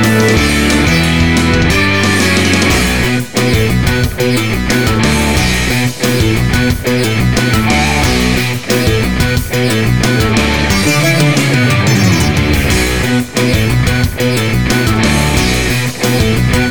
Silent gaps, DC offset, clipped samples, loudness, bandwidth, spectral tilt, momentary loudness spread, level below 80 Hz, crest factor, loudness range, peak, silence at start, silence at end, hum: none; 3%; under 0.1%; -11 LUFS; over 20 kHz; -4.5 dB/octave; 3 LU; -22 dBFS; 12 dB; 2 LU; 0 dBFS; 0 s; 0 s; none